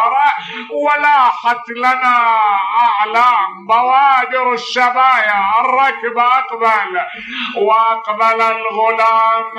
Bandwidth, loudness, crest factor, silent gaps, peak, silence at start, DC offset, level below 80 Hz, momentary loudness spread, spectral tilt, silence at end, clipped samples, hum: 11 kHz; -13 LUFS; 12 dB; none; -2 dBFS; 0 s; under 0.1%; -66 dBFS; 6 LU; -2.5 dB/octave; 0 s; under 0.1%; none